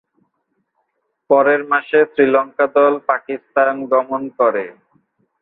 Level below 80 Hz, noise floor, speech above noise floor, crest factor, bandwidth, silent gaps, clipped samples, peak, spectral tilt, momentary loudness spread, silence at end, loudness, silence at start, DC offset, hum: -68 dBFS; -70 dBFS; 54 dB; 16 dB; 4.1 kHz; none; under 0.1%; -2 dBFS; -9 dB/octave; 8 LU; 0.7 s; -16 LUFS; 1.3 s; under 0.1%; none